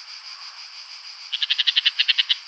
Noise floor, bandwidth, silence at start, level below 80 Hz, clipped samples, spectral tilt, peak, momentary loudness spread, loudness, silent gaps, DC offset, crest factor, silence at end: -39 dBFS; 8.6 kHz; 0 s; under -90 dBFS; under 0.1%; 10 dB/octave; -2 dBFS; 18 LU; -19 LUFS; none; under 0.1%; 22 dB; 0 s